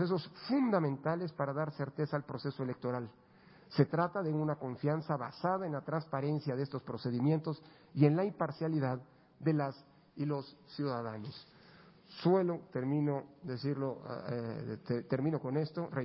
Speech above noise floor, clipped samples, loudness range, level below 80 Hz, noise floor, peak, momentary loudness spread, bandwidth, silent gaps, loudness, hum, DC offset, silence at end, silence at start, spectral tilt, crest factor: 25 dB; under 0.1%; 3 LU; -74 dBFS; -60 dBFS; -14 dBFS; 11 LU; 5.6 kHz; none; -36 LUFS; none; under 0.1%; 0 s; 0 s; -7.5 dB/octave; 22 dB